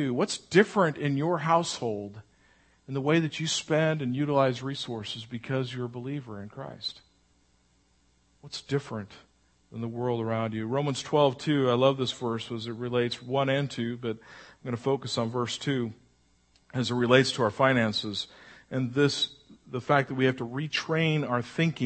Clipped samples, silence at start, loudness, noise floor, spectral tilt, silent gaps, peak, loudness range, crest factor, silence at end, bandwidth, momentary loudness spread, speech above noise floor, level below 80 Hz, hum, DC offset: under 0.1%; 0 s; -28 LUFS; -66 dBFS; -5.5 dB/octave; none; -6 dBFS; 10 LU; 24 dB; 0 s; 8.8 kHz; 14 LU; 39 dB; -68 dBFS; none; under 0.1%